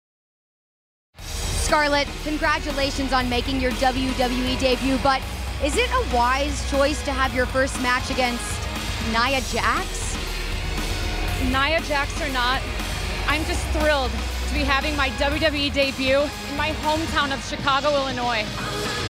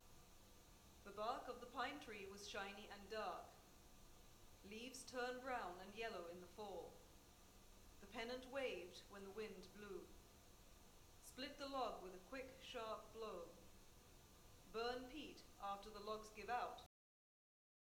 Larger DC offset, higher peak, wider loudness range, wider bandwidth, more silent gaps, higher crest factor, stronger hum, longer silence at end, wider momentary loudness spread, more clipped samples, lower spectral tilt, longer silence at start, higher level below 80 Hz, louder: neither; first, -4 dBFS vs -32 dBFS; about the same, 2 LU vs 2 LU; second, 16 kHz vs 19.5 kHz; neither; about the same, 18 dB vs 22 dB; neither; second, 0 s vs 1 s; second, 7 LU vs 19 LU; neither; about the same, -4 dB/octave vs -3.5 dB/octave; first, 1.2 s vs 0 s; first, -30 dBFS vs -70 dBFS; first, -22 LUFS vs -52 LUFS